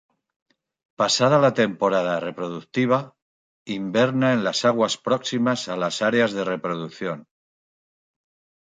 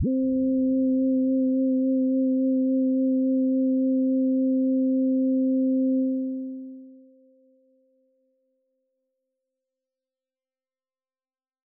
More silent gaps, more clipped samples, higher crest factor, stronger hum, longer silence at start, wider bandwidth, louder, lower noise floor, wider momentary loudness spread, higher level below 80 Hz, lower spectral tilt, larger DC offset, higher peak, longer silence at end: first, 3.22-3.66 s vs none; neither; first, 18 dB vs 8 dB; neither; first, 1 s vs 0 s; first, 9.6 kHz vs 0.6 kHz; about the same, -22 LUFS vs -23 LUFS; about the same, under -90 dBFS vs under -90 dBFS; first, 12 LU vs 3 LU; about the same, -68 dBFS vs -64 dBFS; second, -4.5 dB/octave vs -15 dB/octave; neither; first, -6 dBFS vs -18 dBFS; second, 1.4 s vs 4.75 s